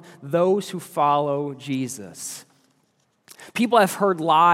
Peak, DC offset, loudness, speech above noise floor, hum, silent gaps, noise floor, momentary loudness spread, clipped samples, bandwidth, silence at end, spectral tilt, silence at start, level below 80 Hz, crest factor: -4 dBFS; under 0.1%; -22 LUFS; 46 dB; none; none; -67 dBFS; 15 LU; under 0.1%; 16.5 kHz; 0 s; -5 dB/octave; 0.05 s; -80 dBFS; 18 dB